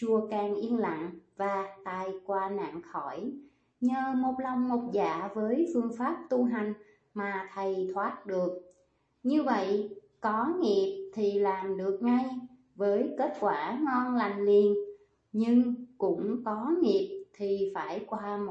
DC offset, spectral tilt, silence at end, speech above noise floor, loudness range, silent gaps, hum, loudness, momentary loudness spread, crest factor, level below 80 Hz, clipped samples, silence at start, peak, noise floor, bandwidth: under 0.1%; -7 dB/octave; 0 s; 41 dB; 5 LU; none; none; -31 LUFS; 11 LU; 16 dB; -74 dBFS; under 0.1%; 0 s; -14 dBFS; -71 dBFS; 8 kHz